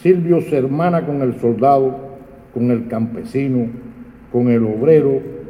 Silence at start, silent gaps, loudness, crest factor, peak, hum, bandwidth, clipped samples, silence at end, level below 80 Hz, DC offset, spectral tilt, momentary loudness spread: 0.05 s; none; -17 LUFS; 16 dB; 0 dBFS; none; 11 kHz; under 0.1%; 0 s; -50 dBFS; under 0.1%; -10 dB/octave; 13 LU